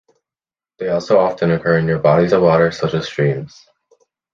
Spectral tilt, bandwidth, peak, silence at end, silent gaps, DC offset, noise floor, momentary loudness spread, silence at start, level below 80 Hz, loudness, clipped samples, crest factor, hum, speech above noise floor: -7 dB/octave; 7.4 kHz; -2 dBFS; 0.85 s; none; under 0.1%; under -90 dBFS; 9 LU; 0.8 s; -48 dBFS; -16 LUFS; under 0.1%; 16 dB; none; over 75 dB